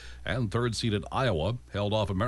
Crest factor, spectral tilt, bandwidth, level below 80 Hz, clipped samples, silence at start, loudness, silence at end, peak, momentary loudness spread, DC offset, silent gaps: 14 dB; -6 dB/octave; 11.5 kHz; -46 dBFS; under 0.1%; 0 s; -30 LUFS; 0 s; -16 dBFS; 4 LU; under 0.1%; none